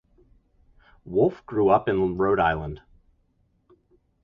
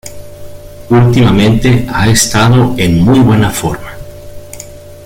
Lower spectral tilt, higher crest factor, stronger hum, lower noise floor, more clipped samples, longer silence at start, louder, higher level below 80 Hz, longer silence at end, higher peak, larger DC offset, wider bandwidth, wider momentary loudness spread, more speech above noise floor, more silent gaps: first, -9.5 dB/octave vs -5.5 dB/octave; first, 22 dB vs 10 dB; neither; first, -67 dBFS vs -29 dBFS; neither; first, 1.05 s vs 0.05 s; second, -23 LUFS vs -9 LUFS; second, -48 dBFS vs -28 dBFS; first, 1.45 s vs 0 s; second, -4 dBFS vs 0 dBFS; neither; second, 5.2 kHz vs 16.5 kHz; second, 11 LU vs 21 LU; first, 44 dB vs 22 dB; neither